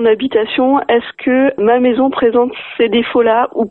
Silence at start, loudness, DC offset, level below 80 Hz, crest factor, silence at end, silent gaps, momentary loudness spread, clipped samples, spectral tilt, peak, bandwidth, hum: 0 s; -13 LUFS; 0.1%; -52 dBFS; 12 dB; 0 s; none; 4 LU; under 0.1%; -9 dB/octave; 0 dBFS; 4.2 kHz; none